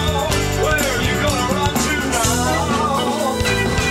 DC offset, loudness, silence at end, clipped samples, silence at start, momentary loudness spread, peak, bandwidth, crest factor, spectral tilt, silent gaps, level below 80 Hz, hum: under 0.1%; -18 LUFS; 0 s; under 0.1%; 0 s; 2 LU; -4 dBFS; 16 kHz; 14 dB; -4 dB/octave; none; -30 dBFS; none